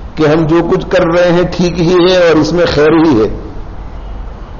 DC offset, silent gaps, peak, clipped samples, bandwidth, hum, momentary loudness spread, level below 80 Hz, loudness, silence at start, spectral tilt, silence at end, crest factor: under 0.1%; none; 0 dBFS; under 0.1%; 7.2 kHz; none; 20 LU; -26 dBFS; -9 LUFS; 0 s; -5 dB/octave; 0 s; 10 dB